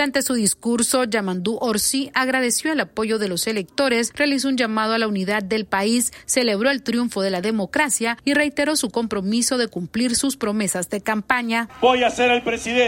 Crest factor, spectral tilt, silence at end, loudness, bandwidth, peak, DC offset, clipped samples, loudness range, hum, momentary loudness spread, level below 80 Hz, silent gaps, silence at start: 18 dB; -3 dB/octave; 0 s; -20 LUFS; 16.5 kHz; -2 dBFS; under 0.1%; under 0.1%; 1 LU; none; 4 LU; -54 dBFS; none; 0 s